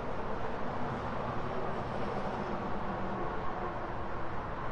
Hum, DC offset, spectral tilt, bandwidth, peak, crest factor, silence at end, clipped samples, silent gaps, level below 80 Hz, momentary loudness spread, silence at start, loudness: none; under 0.1%; -7.5 dB/octave; 8 kHz; -22 dBFS; 12 dB; 0 s; under 0.1%; none; -48 dBFS; 3 LU; 0 s; -37 LUFS